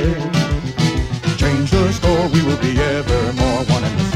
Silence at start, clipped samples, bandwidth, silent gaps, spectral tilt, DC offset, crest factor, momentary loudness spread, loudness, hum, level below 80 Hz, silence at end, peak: 0 s; under 0.1%; 14 kHz; none; -6 dB/octave; under 0.1%; 14 dB; 3 LU; -17 LUFS; none; -26 dBFS; 0 s; -2 dBFS